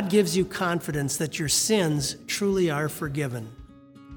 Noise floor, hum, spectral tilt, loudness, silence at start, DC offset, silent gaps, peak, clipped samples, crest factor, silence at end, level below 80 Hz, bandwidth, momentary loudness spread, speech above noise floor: -48 dBFS; none; -4 dB/octave; -25 LUFS; 0 s; under 0.1%; none; -8 dBFS; under 0.1%; 18 dB; 0 s; -52 dBFS; over 20 kHz; 8 LU; 23 dB